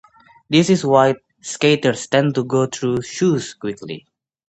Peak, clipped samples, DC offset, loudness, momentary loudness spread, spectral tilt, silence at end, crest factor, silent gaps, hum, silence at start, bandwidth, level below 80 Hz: 0 dBFS; under 0.1%; under 0.1%; -18 LUFS; 14 LU; -5 dB/octave; 0.5 s; 18 dB; none; none; 0.5 s; 9 kHz; -58 dBFS